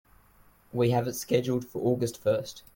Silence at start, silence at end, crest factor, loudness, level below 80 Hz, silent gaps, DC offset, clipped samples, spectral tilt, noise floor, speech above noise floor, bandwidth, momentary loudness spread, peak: 0.75 s; 0.15 s; 18 dB; -28 LUFS; -62 dBFS; none; under 0.1%; under 0.1%; -6 dB/octave; -60 dBFS; 32 dB; 17 kHz; 5 LU; -12 dBFS